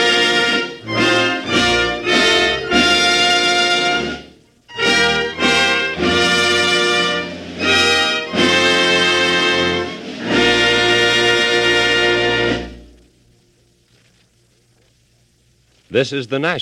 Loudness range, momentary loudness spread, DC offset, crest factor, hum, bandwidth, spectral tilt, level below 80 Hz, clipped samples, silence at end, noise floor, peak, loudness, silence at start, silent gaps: 7 LU; 8 LU; under 0.1%; 16 dB; none; 14 kHz; -2.5 dB/octave; -44 dBFS; under 0.1%; 0 s; -57 dBFS; 0 dBFS; -14 LUFS; 0 s; none